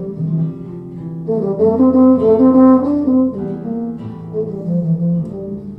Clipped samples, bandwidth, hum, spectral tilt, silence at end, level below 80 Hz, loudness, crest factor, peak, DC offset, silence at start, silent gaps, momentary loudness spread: under 0.1%; 2.2 kHz; none; -12.5 dB/octave; 0 s; -48 dBFS; -15 LUFS; 14 dB; 0 dBFS; under 0.1%; 0 s; none; 16 LU